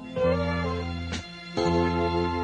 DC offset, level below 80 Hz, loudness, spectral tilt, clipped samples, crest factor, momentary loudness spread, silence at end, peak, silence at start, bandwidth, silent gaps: under 0.1%; -46 dBFS; -27 LUFS; -6.5 dB/octave; under 0.1%; 14 dB; 9 LU; 0 s; -12 dBFS; 0 s; 9.8 kHz; none